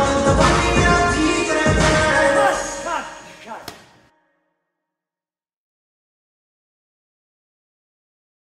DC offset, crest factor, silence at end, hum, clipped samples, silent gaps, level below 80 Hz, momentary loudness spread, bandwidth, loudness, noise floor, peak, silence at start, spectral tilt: under 0.1%; 20 dB; 4.65 s; none; under 0.1%; none; -32 dBFS; 20 LU; 14 kHz; -17 LUFS; under -90 dBFS; -2 dBFS; 0 s; -4.5 dB/octave